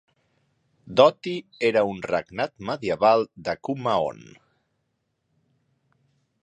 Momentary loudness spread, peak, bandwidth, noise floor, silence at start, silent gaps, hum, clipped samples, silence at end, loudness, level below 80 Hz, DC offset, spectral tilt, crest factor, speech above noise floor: 12 LU; -4 dBFS; 9.4 kHz; -75 dBFS; 0.9 s; none; none; under 0.1%; 2.25 s; -24 LUFS; -62 dBFS; under 0.1%; -5.5 dB/octave; 22 dB; 52 dB